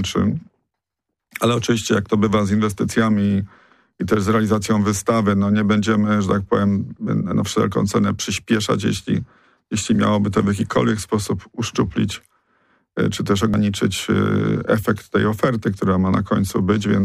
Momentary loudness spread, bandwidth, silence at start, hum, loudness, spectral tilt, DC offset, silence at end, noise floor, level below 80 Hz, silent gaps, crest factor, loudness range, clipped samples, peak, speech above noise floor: 6 LU; 15 kHz; 0 s; none; -19 LUFS; -6 dB/octave; under 0.1%; 0 s; -81 dBFS; -46 dBFS; none; 14 dB; 3 LU; under 0.1%; -6 dBFS; 63 dB